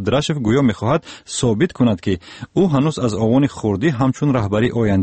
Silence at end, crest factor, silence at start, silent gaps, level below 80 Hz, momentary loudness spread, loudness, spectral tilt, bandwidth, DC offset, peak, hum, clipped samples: 0 s; 14 dB; 0 s; none; -44 dBFS; 6 LU; -18 LUFS; -6.5 dB/octave; 8.8 kHz; under 0.1%; -4 dBFS; none; under 0.1%